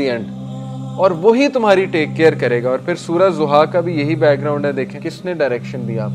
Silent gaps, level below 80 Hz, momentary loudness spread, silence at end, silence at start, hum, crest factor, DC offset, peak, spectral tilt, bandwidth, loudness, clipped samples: none; -56 dBFS; 12 LU; 0 s; 0 s; none; 16 dB; under 0.1%; 0 dBFS; -7 dB/octave; 11 kHz; -16 LUFS; under 0.1%